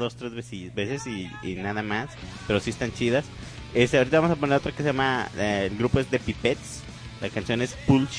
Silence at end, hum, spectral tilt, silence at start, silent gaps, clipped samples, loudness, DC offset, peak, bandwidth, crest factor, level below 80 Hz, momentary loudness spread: 0 s; none; -5.5 dB/octave; 0 s; none; under 0.1%; -26 LUFS; under 0.1%; -8 dBFS; 10.5 kHz; 18 dB; -46 dBFS; 14 LU